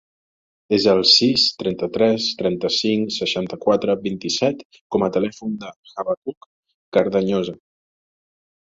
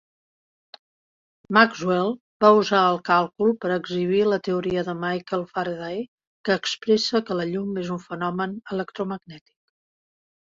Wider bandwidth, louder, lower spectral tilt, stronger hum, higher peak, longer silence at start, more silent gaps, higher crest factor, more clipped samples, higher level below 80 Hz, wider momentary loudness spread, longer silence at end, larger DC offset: about the same, 7.8 kHz vs 7.6 kHz; first, -19 LUFS vs -23 LUFS; about the same, -4.5 dB/octave vs -5.5 dB/octave; neither; about the same, -2 dBFS vs -2 dBFS; second, 0.7 s vs 1.5 s; first, 4.65-4.70 s, 4.81-4.90 s, 5.76-5.83 s, 6.17-6.22 s, 6.37-6.63 s, 6.74-6.92 s vs 2.20-2.40 s, 6.08-6.18 s, 6.27-6.44 s; about the same, 20 dB vs 22 dB; neither; first, -58 dBFS vs -64 dBFS; first, 16 LU vs 13 LU; about the same, 1.1 s vs 1.15 s; neither